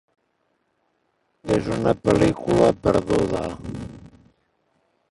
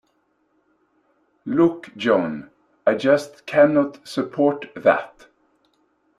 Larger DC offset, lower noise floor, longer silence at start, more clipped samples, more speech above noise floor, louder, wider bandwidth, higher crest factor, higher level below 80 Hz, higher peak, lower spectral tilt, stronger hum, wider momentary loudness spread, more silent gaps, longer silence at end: neither; about the same, -70 dBFS vs -67 dBFS; about the same, 1.45 s vs 1.45 s; neither; about the same, 50 dB vs 47 dB; about the same, -21 LUFS vs -20 LUFS; about the same, 11.5 kHz vs 12.5 kHz; about the same, 20 dB vs 20 dB; first, -44 dBFS vs -66 dBFS; about the same, -4 dBFS vs -2 dBFS; about the same, -7 dB/octave vs -6.5 dB/octave; second, none vs 50 Hz at -55 dBFS; first, 16 LU vs 11 LU; neither; about the same, 1.15 s vs 1.1 s